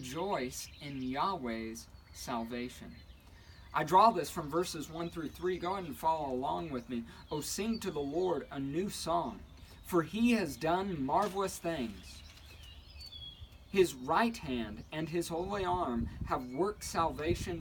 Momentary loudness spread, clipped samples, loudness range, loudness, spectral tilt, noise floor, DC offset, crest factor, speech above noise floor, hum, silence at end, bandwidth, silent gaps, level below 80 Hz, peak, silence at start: 18 LU; under 0.1%; 4 LU; -35 LUFS; -5 dB/octave; -55 dBFS; under 0.1%; 22 dB; 21 dB; none; 0 s; 19 kHz; none; -54 dBFS; -12 dBFS; 0 s